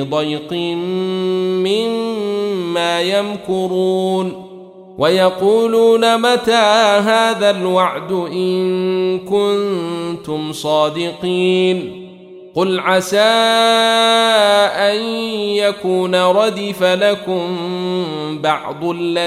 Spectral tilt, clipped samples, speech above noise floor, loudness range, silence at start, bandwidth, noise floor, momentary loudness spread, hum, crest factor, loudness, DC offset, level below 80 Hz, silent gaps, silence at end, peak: -4.5 dB/octave; under 0.1%; 22 dB; 5 LU; 0 s; 14.5 kHz; -37 dBFS; 9 LU; none; 14 dB; -15 LUFS; under 0.1%; -60 dBFS; none; 0 s; 0 dBFS